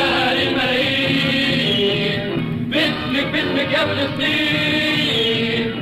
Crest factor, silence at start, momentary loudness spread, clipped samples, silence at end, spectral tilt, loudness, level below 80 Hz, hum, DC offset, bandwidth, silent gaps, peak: 12 dB; 0 s; 4 LU; under 0.1%; 0 s; -5 dB/octave; -17 LUFS; -46 dBFS; none; under 0.1%; 16 kHz; none; -6 dBFS